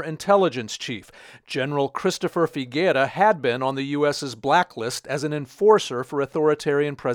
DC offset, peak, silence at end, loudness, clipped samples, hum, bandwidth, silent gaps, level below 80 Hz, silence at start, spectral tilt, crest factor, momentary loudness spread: under 0.1%; -4 dBFS; 0 s; -22 LUFS; under 0.1%; none; 16 kHz; none; -64 dBFS; 0 s; -5 dB/octave; 20 dB; 10 LU